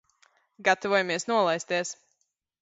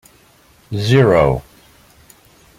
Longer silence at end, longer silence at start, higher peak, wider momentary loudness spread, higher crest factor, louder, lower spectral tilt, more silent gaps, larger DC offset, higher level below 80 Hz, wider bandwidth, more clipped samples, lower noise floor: second, 0.7 s vs 1.15 s; about the same, 0.6 s vs 0.7 s; second, -8 dBFS vs -2 dBFS; second, 9 LU vs 14 LU; first, 22 dB vs 16 dB; second, -26 LUFS vs -15 LUFS; second, -3 dB/octave vs -7 dB/octave; neither; neither; second, -76 dBFS vs -40 dBFS; second, 8 kHz vs 15 kHz; neither; first, -76 dBFS vs -50 dBFS